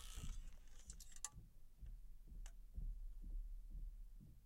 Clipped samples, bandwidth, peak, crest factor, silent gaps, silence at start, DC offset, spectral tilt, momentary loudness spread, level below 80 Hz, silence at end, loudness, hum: under 0.1%; 16 kHz; -28 dBFS; 24 dB; none; 0 s; under 0.1%; -3 dB/octave; 11 LU; -52 dBFS; 0 s; -58 LUFS; none